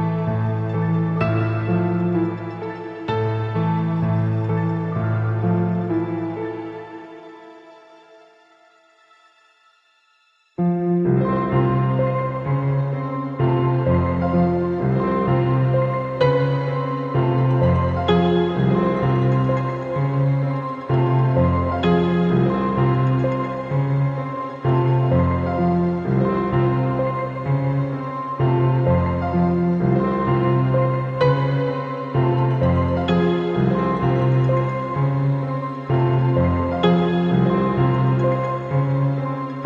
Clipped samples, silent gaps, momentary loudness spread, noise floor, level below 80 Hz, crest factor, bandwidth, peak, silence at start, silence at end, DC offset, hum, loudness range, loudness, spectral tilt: under 0.1%; none; 6 LU; -61 dBFS; -42 dBFS; 14 dB; 5 kHz; -4 dBFS; 0 s; 0 s; under 0.1%; none; 4 LU; -20 LUFS; -10 dB/octave